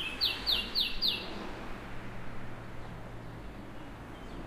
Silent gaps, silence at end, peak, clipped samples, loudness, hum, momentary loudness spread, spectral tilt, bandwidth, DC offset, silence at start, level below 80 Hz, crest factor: none; 0 s; -18 dBFS; under 0.1%; -32 LUFS; none; 18 LU; -3.5 dB/octave; 15.5 kHz; under 0.1%; 0 s; -48 dBFS; 18 dB